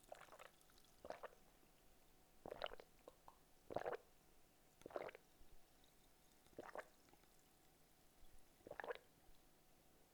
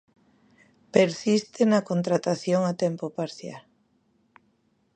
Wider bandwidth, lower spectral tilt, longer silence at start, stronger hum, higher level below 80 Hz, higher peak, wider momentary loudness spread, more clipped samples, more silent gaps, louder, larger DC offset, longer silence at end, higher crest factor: first, over 20 kHz vs 9.4 kHz; second, -3.5 dB/octave vs -6 dB/octave; second, 0 s vs 0.95 s; neither; about the same, -76 dBFS vs -74 dBFS; second, -28 dBFS vs -4 dBFS; first, 16 LU vs 12 LU; neither; neither; second, -56 LUFS vs -25 LUFS; neither; second, 0 s vs 1.35 s; first, 30 dB vs 22 dB